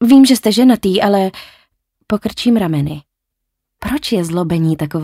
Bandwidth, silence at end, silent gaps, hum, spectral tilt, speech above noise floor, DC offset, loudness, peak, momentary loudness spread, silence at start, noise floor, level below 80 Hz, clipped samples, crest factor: 16 kHz; 0 s; none; none; -6 dB/octave; 63 dB; under 0.1%; -14 LUFS; -2 dBFS; 12 LU; 0 s; -76 dBFS; -44 dBFS; under 0.1%; 14 dB